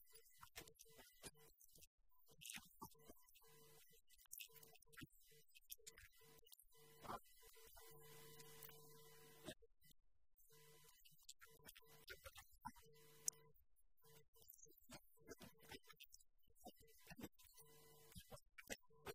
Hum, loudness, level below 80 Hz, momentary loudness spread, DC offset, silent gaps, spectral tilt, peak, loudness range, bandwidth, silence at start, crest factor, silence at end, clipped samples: none; -61 LUFS; -80 dBFS; 12 LU; under 0.1%; 1.87-1.98 s, 14.28-14.33 s; -2 dB/octave; -26 dBFS; 7 LU; 16 kHz; 0 s; 38 dB; 0 s; under 0.1%